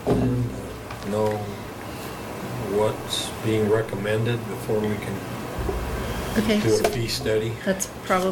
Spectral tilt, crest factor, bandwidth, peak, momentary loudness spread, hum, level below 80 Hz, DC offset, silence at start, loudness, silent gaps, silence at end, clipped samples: -5 dB/octave; 18 dB; 18 kHz; -6 dBFS; 12 LU; none; -40 dBFS; under 0.1%; 0 s; -25 LUFS; none; 0 s; under 0.1%